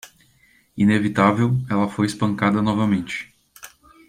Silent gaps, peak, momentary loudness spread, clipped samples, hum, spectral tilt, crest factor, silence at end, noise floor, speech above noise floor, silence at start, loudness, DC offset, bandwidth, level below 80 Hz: none; -2 dBFS; 13 LU; under 0.1%; none; -6.5 dB/octave; 20 dB; 0.4 s; -58 dBFS; 38 dB; 0.05 s; -20 LUFS; under 0.1%; 14.5 kHz; -54 dBFS